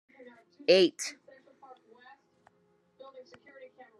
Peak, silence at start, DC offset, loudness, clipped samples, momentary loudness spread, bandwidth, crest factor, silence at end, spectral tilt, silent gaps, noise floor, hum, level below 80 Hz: -8 dBFS; 0.7 s; under 0.1%; -27 LUFS; under 0.1%; 29 LU; 12 kHz; 26 dB; 0.8 s; -3.5 dB/octave; none; -70 dBFS; none; -90 dBFS